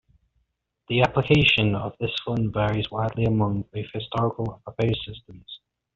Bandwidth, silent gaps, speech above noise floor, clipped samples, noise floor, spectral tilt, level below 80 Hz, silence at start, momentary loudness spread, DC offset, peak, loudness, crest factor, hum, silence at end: 7.4 kHz; none; 49 dB; under 0.1%; -73 dBFS; -4.5 dB/octave; -48 dBFS; 0.9 s; 20 LU; under 0.1%; -4 dBFS; -24 LUFS; 22 dB; none; 0.4 s